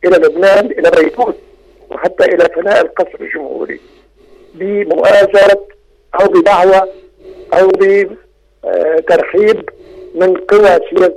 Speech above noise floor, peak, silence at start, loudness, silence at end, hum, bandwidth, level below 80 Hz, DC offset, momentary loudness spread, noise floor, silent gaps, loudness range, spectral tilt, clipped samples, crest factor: 33 dB; -2 dBFS; 0.05 s; -10 LUFS; 0 s; none; 12 kHz; -46 dBFS; under 0.1%; 14 LU; -43 dBFS; none; 5 LU; -5 dB/octave; under 0.1%; 10 dB